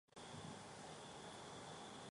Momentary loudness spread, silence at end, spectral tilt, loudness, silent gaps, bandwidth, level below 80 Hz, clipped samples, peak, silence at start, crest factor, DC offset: 1 LU; 0 s; -3.5 dB/octave; -54 LUFS; none; 11.5 kHz; -78 dBFS; under 0.1%; -40 dBFS; 0.1 s; 14 dB; under 0.1%